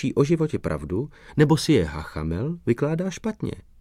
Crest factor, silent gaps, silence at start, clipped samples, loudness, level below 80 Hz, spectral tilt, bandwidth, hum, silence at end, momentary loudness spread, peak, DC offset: 18 dB; none; 0 s; under 0.1%; -24 LUFS; -42 dBFS; -6.5 dB/octave; 14.5 kHz; none; 0.2 s; 10 LU; -4 dBFS; under 0.1%